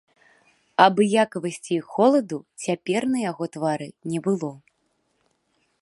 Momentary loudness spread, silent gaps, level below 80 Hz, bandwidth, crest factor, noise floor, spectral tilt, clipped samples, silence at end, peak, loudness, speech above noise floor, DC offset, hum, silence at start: 12 LU; none; -74 dBFS; 11.5 kHz; 24 dB; -71 dBFS; -5.5 dB/octave; under 0.1%; 1.25 s; -2 dBFS; -23 LUFS; 48 dB; under 0.1%; none; 0.8 s